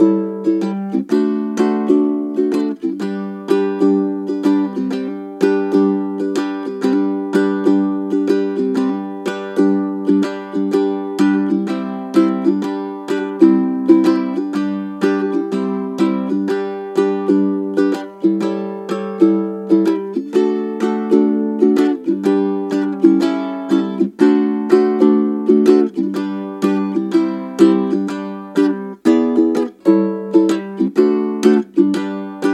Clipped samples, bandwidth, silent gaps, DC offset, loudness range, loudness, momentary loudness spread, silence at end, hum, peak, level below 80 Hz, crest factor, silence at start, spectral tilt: under 0.1%; 12 kHz; none; under 0.1%; 3 LU; -17 LUFS; 8 LU; 0 s; none; 0 dBFS; -72 dBFS; 16 dB; 0 s; -7.5 dB/octave